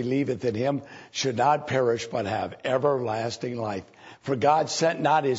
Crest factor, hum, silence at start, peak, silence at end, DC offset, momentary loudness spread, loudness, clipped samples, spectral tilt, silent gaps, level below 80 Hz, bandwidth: 16 dB; none; 0 s; -8 dBFS; 0 s; under 0.1%; 10 LU; -26 LUFS; under 0.1%; -5 dB/octave; none; -66 dBFS; 8 kHz